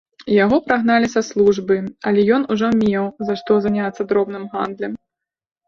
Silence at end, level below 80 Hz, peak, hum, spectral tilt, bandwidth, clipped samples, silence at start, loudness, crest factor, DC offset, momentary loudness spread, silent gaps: 0.7 s; -54 dBFS; 0 dBFS; none; -6 dB/octave; 7.2 kHz; under 0.1%; 0.2 s; -18 LUFS; 18 dB; under 0.1%; 9 LU; none